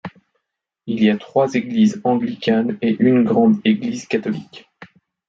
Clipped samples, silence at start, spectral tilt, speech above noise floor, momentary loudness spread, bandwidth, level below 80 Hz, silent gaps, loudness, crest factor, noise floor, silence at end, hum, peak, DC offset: under 0.1%; 0.05 s; -6.5 dB/octave; 59 dB; 12 LU; 7.6 kHz; -62 dBFS; none; -18 LUFS; 16 dB; -76 dBFS; 0.45 s; none; -2 dBFS; under 0.1%